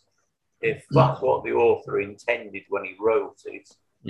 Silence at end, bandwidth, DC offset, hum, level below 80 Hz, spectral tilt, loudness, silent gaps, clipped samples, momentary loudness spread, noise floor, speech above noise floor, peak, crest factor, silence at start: 0 s; 10.5 kHz; under 0.1%; none; -58 dBFS; -7.5 dB/octave; -24 LUFS; none; under 0.1%; 15 LU; -74 dBFS; 51 dB; -4 dBFS; 20 dB; 0.6 s